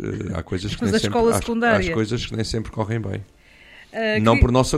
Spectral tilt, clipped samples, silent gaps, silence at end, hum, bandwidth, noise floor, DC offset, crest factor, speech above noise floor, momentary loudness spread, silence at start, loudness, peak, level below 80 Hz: -5.5 dB/octave; under 0.1%; none; 0 s; none; 15 kHz; -47 dBFS; under 0.1%; 18 dB; 27 dB; 11 LU; 0 s; -21 LUFS; -4 dBFS; -34 dBFS